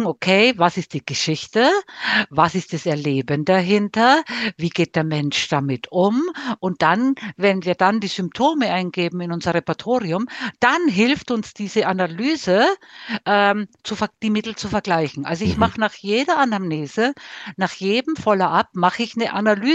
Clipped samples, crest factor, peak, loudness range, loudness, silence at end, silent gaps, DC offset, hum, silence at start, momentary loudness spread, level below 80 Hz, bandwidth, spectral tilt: under 0.1%; 18 dB; 0 dBFS; 2 LU; -20 LUFS; 0 s; none; under 0.1%; none; 0 s; 8 LU; -52 dBFS; 8.6 kHz; -5 dB/octave